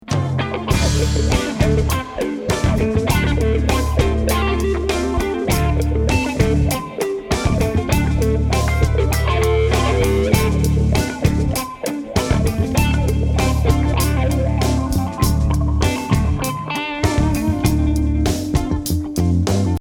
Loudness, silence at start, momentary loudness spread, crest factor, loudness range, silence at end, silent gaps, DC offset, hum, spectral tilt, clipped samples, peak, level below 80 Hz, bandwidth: -18 LUFS; 0.05 s; 4 LU; 16 dB; 2 LU; 0 s; none; under 0.1%; none; -6 dB/octave; under 0.1%; 0 dBFS; -22 dBFS; 18 kHz